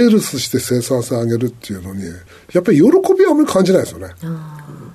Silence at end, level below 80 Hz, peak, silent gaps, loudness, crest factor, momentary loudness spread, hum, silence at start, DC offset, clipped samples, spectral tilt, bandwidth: 0 s; -50 dBFS; -2 dBFS; none; -14 LUFS; 12 dB; 17 LU; none; 0 s; under 0.1%; under 0.1%; -6 dB/octave; 13.5 kHz